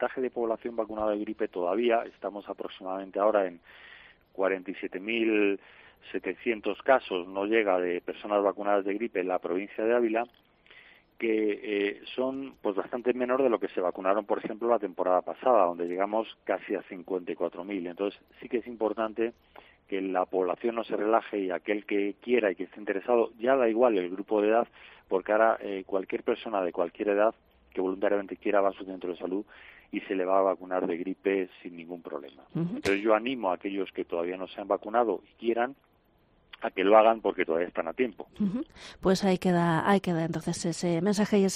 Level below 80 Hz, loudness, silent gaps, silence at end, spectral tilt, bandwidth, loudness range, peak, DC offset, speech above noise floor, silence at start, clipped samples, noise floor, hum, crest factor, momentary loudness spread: -66 dBFS; -29 LUFS; none; 0 s; -6 dB/octave; 13 kHz; 4 LU; -6 dBFS; under 0.1%; 37 dB; 0 s; under 0.1%; -65 dBFS; none; 24 dB; 11 LU